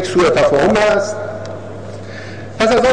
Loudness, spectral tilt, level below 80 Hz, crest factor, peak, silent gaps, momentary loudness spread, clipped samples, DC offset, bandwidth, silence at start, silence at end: -14 LUFS; -5 dB/octave; -40 dBFS; 12 dB; -4 dBFS; none; 18 LU; under 0.1%; 1%; 10.5 kHz; 0 s; 0 s